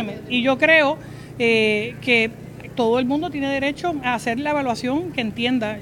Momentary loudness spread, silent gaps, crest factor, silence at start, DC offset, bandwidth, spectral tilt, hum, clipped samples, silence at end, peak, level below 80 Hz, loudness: 9 LU; none; 18 dB; 0 s; under 0.1%; 17 kHz; -5 dB/octave; none; under 0.1%; 0 s; -2 dBFS; -52 dBFS; -20 LUFS